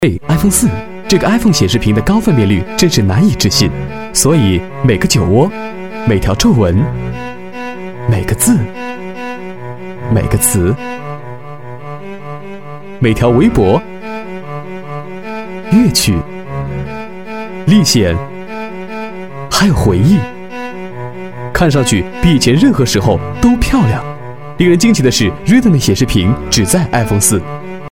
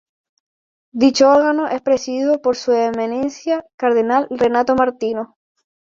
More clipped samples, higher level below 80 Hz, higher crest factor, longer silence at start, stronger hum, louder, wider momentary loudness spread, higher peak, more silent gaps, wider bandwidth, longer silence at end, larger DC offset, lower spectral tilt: neither; first, -28 dBFS vs -58 dBFS; about the same, 12 dB vs 16 dB; second, 0 s vs 0.95 s; neither; first, -11 LUFS vs -17 LUFS; first, 16 LU vs 10 LU; about the same, 0 dBFS vs -2 dBFS; second, none vs 3.74-3.78 s; first, 17 kHz vs 7.8 kHz; second, 0 s vs 0.6 s; first, 3% vs under 0.1%; about the same, -5 dB/octave vs -4 dB/octave